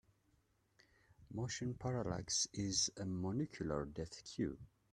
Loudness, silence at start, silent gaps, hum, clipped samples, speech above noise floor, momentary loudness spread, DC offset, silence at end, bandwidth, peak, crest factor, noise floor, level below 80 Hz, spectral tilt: -41 LUFS; 1.2 s; none; none; under 0.1%; 36 dB; 10 LU; under 0.1%; 0.25 s; 13 kHz; -24 dBFS; 20 dB; -77 dBFS; -64 dBFS; -4 dB/octave